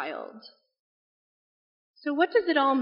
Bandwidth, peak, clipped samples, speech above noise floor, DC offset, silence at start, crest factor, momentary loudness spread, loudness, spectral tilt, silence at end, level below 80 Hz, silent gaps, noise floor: 5.4 kHz; -10 dBFS; under 0.1%; over 64 dB; under 0.1%; 0 s; 20 dB; 16 LU; -26 LUFS; 0 dB/octave; 0 s; -80 dBFS; 0.80-1.94 s; under -90 dBFS